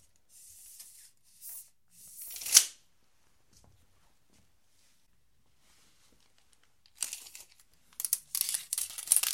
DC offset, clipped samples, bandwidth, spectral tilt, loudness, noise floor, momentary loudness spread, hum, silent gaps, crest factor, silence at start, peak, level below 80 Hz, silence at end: under 0.1%; under 0.1%; 17 kHz; 3.5 dB/octave; -28 LUFS; -73 dBFS; 28 LU; none; none; 36 dB; 0.45 s; 0 dBFS; -76 dBFS; 0 s